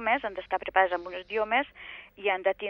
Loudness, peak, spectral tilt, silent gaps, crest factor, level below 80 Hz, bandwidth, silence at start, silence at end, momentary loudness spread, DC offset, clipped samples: -29 LUFS; -8 dBFS; -5.5 dB/octave; none; 22 dB; -62 dBFS; 5.8 kHz; 0 s; 0 s; 12 LU; under 0.1%; under 0.1%